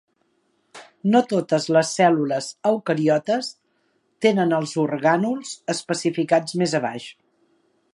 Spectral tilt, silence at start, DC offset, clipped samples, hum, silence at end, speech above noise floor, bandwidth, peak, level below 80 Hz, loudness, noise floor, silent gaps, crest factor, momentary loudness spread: -5 dB/octave; 0.75 s; under 0.1%; under 0.1%; none; 0.85 s; 47 dB; 11.5 kHz; -4 dBFS; -72 dBFS; -21 LUFS; -68 dBFS; none; 20 dB; 9 LU